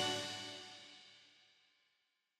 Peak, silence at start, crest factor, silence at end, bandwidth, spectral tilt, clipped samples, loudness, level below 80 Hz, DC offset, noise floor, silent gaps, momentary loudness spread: -26 dBFS; 0 s; 22 dB; 0.95 s; 15 kHz; -2 dB/octave; under 0.1%; -44 LUFS; -86 dBFS; under 0.1%; -83 dBFS; none; 22 LU